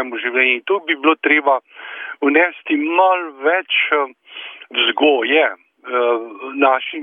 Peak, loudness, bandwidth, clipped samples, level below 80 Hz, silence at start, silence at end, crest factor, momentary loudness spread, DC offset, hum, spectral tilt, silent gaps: -2 dBFS; -16 LUFS; 3.8 kHz; under 0.1%; -72 dBFS; 0 s; 0 s; 16 dB; 15 LU; under 0.1%; none; -5.5 dB/octave; none